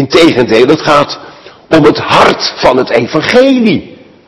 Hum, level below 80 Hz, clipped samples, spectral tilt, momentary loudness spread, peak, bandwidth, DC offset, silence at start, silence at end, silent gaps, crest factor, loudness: none; -40 dBFS; 5%; -5 dB/octave; 5 LU; 0 dBFS; 12 kHz; under 0.1%; 0 s; 0.35 s; none; 8 dB; -8 LUFS